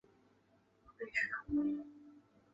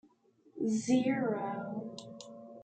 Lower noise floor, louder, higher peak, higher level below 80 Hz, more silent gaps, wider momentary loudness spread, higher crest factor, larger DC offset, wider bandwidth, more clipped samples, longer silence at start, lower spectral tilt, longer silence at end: first, -72 dBFS vs -66 dBFS; second, -38 LUFS vs -33 LUFS; second, -22 dBFS vs -18 dBFS; first, -66 dBFS vs -78 dBFS; neither; about the same, 17 LU vs 19 LU; about the same, 20 dB vs 18 dB; neither; second, 7.6 kHz vs 9 kHz; neither; first, 0.9 s vs 0.55 s; second, -4 dB/octave vs -5.5 dB/octave; first, 0.35 s vs 0 s